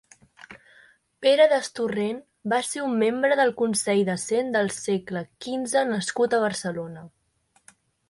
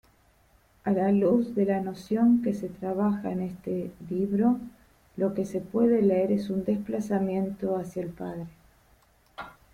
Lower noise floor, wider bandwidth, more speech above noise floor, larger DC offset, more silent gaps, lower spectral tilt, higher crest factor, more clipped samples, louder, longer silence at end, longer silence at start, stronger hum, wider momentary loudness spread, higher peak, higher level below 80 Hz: first, -67 dBFS vs -62 dBFS; second, 11.5 kHz vs 13.5 kHz; first, 43 dB vs 36 dB; neither; neither; second, -4 dB/octave vs -8.5 dB/octave; about the same, 18 dB vs 16 dB; neither; first, -24 LUFS vs -27 LUFS; first, 1 s vs 0.25 s; second, 0.5 s vs 0.85 s; neither; about the same, 12 LU vs 14 LU; first, -6 dBFS vs -12 dBFS; second, -68 dBFS vs -60 dBFS